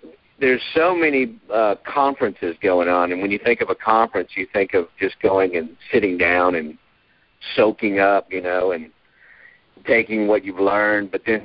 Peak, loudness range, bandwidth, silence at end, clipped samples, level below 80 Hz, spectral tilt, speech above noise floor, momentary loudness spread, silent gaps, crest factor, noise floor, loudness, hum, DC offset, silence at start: -2 dBFS; 2 LU; 5.4 kHz; 0 s; under 0.1%; -54 dBFS; -9.5 dB/octave; 41 dB; 7 LU; none; 18 dB; -60 dBFS; -19 LUFS; none; under 0.1%; 0.05 s